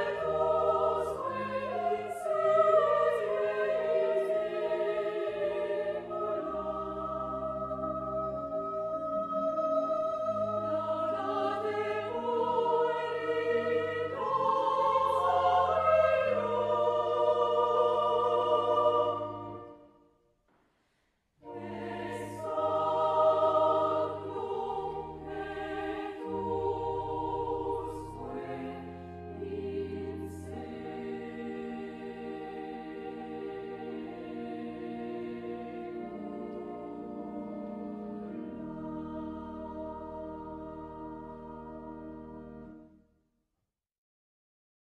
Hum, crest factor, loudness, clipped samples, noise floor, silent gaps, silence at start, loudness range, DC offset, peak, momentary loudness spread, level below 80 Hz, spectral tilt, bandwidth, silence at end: none; 18 dB; -32 LUFS; under 0.1%; -86 dBFS; none; 0 s; 13 LU; under 0.1%; -14 dBFS; 15 LU; -60 dBFS; -6.5 dB/octave; 11.5 kHz; 2 s